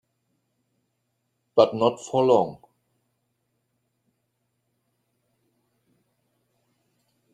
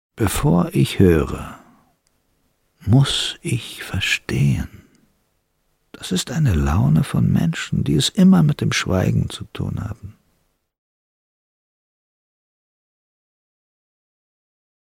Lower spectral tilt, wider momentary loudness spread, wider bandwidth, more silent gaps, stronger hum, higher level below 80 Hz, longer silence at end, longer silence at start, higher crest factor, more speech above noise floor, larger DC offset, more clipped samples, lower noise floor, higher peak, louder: about the same, -6 dB/octave vs -5.5 dB/octave; second, 6 LU vs 13 LU; second, 10.5 kHz vs 16.5 kHz; neither; neither; second, -74 dBFS vs -36 dBFS; about the same, 4.8 s vs 4.7 s; first, 1.55 s vs 0.15 s; first, 26 dB vs 18 dB; first, 55 dB vs 49 dB; neither; neither; first, -76 dBFS vs -67 dBFS; about the same, -4 dBFS vs -2 dBFS; second, -22 LUFS vs -19 LUFS